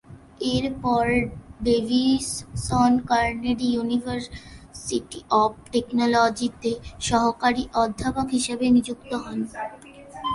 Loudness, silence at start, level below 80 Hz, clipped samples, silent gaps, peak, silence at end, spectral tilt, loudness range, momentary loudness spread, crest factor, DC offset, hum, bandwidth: -24 LUFS; 0.1 s; -44 dBFS; under 0.1%; none; -6 dBFS; 0 s; -4.5 dB/octave; 2 LU; 12 LU; 16 dB; under 0.1%; none; 11.5 kHz